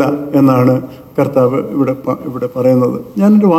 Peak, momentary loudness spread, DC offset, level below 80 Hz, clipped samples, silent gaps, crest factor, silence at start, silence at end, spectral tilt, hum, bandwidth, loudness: 0 dBFS; 10 LU; under 0.1%; -52 dBFS; under 0.1%; none; 12 dB; 0 s; 0 s; -9 dB/octave; none; 15 kHz; -13 LUFS